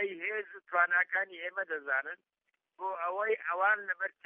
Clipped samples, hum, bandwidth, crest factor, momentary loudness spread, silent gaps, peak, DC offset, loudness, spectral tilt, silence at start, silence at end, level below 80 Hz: under 0.1%; none; 3.8 kHz; 20 dB; 12 LU; none; -14 dBFS; under 0.1%; -32 LUFS; -5 dB/octave; 0 s; 0.15 s; under -90 dBFS